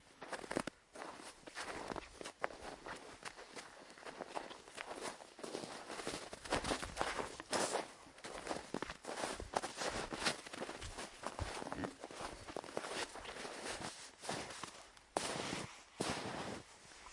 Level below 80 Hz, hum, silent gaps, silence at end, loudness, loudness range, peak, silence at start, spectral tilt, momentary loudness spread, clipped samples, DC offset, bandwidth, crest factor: -64 dBFS; none; none; 0 s; -45 LUFS; 7 LU; -18 dBFS; 0 s; -3 dB/octave; 12 LU; under 0.1%; under 0.1%; 11.5 kHz; 28 dB